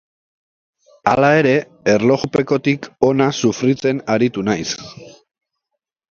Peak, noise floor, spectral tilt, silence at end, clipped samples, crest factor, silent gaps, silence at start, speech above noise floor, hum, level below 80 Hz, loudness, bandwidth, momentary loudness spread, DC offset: 0 dBFS; -79 dBFS; -5.5 dB/octave; 1.05 s; under 0.1%; 18 dB; none; 1.05 s; 63 dB; none; -54 dBFS; -17 LUFS; 7.4 kHz; 8 LU; under 0.1%